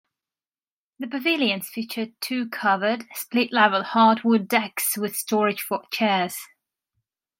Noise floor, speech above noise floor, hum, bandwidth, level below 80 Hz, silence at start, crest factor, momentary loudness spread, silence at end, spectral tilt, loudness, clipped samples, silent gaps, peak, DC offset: under -90 dBFS; over 67 dB; none; 16.5 kHz; -78 dBFS; 1 s; 22 dB; 11 LU; 0.95 s; -3.5 dB/octave; -23 LUFS; under 0.1%; none; -2 dBFS; under 0.1%